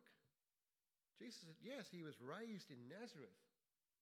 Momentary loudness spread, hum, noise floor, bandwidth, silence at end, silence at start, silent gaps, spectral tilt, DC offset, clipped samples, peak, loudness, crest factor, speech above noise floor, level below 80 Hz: 8 LU; none; under -90 dBFS; 15.5 kHz; 0.55 s; 0 s; none; -5 dB/octave; under 0.1%; under 0.1%; -40 dBFS; -57 LUFS; 18 dB; over 34 dB; under -90 dBFS